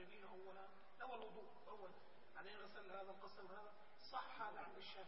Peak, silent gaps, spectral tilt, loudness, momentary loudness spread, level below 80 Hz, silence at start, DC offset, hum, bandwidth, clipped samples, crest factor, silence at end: -36 dBFS; none; -1 dB/octave; -57 LUFS; 10 LU; -86 dBFS; 0 s; 0.1%; none; 5.6 kHz; under 0.1%; 22 dB; 0 s